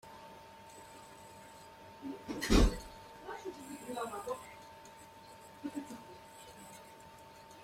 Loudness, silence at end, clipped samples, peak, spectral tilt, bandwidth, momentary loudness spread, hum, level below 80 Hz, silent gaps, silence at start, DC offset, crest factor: -38 LUFS; 0 s; under 0.1%; -14 dBFS; -5 dB/octave; 16 kHz; 21 LU; none; -44 dBFS; none; 0.05 s; under 0.1%; 26 dB